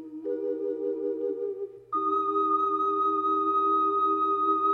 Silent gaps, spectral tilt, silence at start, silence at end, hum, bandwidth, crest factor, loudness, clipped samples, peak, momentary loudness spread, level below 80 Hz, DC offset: none; -7.5 dB/octave; 0 s; 0 s; none; 4 kHz; 12 dB; -27 LUFS; under 0.1%; -16 dBFS; 9 LU; -78 dBFS; under 0.1%